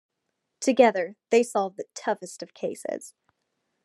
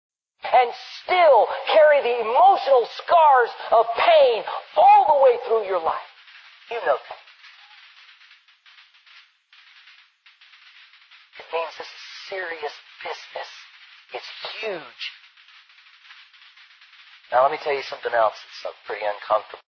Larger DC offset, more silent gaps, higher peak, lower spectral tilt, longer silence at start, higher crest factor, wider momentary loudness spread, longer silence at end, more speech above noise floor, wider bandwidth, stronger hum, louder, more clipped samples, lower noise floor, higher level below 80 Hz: neither; neither; about the same, -4 dBFS vs -6 dBFS; about the same, -4 dB/octave vs -3 dB/octave; first, 0.6 s vs 0.45 s; first, 22 dB vs 16 dB; second, 14 LU vs 20 LU; first, 0.75 s vs 0.2 s; first, 55 dB vs 35 dB; first, 12.5 kHz vs 6.6 kHz; neither; second, -26 LUFS vs -19 LUFS; neither; first, -80 dBFS vs -54 dBFS; second, -90 dBFS vs -72 dBFS